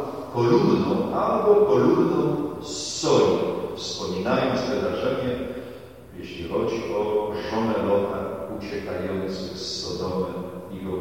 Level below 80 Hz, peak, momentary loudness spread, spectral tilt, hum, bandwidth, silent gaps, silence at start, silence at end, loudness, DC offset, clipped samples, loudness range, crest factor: -52 dBFS; -6 dBFS; 14 LU; -5.5 dB/octave; none; 16.5 kHz; none; 0 s; 0 s; -24 LUFS; 0.2%; under 0.1%; 6 LU; 18 dB